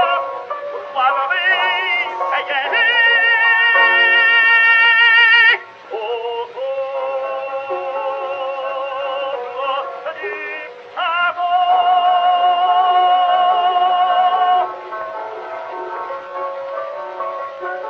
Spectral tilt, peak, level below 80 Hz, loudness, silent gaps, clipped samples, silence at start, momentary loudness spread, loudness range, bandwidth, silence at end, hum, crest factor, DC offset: -1.5 dB/octave; 0 dBFS; -76 dBFS; -14 LUFS; none; under 0.1%; 0 s; 17 LU; 13 LU; 6.4 kHz; 0 s; none; 16 dB; under 0.1%